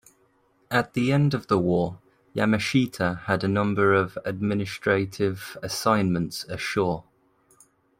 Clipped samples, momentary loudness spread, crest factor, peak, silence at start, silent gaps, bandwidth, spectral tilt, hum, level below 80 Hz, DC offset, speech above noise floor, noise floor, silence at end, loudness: under 0.1%; 8 LU; 20 dB; -6 dBFS; 0.7 s; none; 16 kHz; -6 dB/octave; none; -58 dBFS; under 0.1%; 40 dB; -64 dBFS; 1 s; -25 LUFS